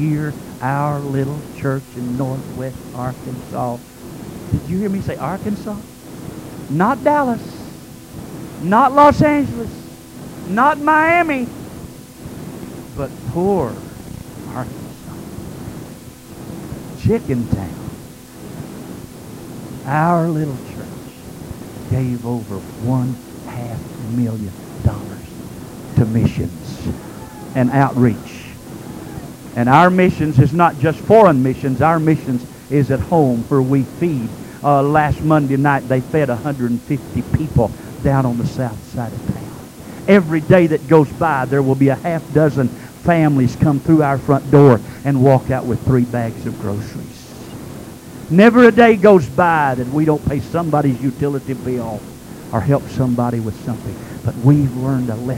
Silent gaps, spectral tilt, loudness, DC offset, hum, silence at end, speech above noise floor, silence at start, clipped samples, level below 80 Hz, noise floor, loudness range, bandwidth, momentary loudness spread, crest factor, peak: none; -7.5 dB/octave; -16 LUFS; under 0.1%; none; 0 s; 20 dB; 0 s; under 0.1%; -40 dBFS; -36 dBFS; 11 LU; 16 kHz; 21 LU; 16 dB; 0 dBFS